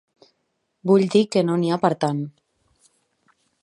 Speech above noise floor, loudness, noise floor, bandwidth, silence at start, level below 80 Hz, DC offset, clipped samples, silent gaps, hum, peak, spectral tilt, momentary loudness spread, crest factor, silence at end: 54 dB; -20 LUFS; -73 dBFS; 11.5 kHz; 0.85 s; -72 dBFS; under 0.1%; under 0.1%; none; none; -4 dBFS; -7 dB/octave; 13 LU; 20 dB; 1.35 s